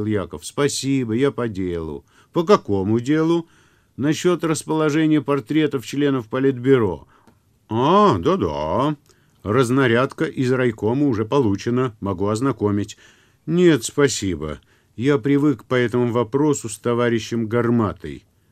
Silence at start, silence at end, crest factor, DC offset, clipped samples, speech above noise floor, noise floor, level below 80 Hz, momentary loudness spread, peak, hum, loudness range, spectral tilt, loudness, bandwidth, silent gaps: 0 s; 0.3 s; 20 dB; under 0.1%; under 0.1%; 37 dB; -56 dBFS; -50 dBFS; 9 LU; 0 dBFS; none; 2 LU; -6 dB/octave; -20 LUFS; 15 kHz; none